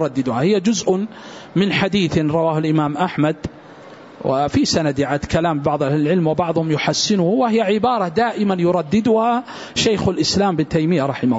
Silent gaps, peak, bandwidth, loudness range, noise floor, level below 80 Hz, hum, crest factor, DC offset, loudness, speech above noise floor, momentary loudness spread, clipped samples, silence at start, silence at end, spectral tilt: none; -4 dBFS; 8 kHz; 2 LU; -40 dBFS; -46 dBFS; none; 14 dB; under 0.1%; -18 LUFS; 22 dB; 4 LU; under 0.1%; 0 s; 0 s; -5.5 dB/octave